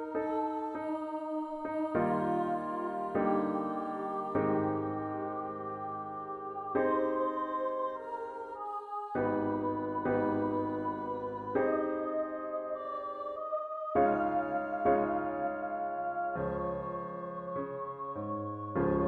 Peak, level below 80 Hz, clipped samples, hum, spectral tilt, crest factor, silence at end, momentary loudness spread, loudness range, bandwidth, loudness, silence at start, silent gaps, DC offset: -16 dBFS; -62 dBFS; under 0.1%; none; -9.5 dB/octave; 18 dB; 0 s; 9 LU; 3 LU; 4.5 kHz; -34 LUFS; 0 s; none; under 0.1%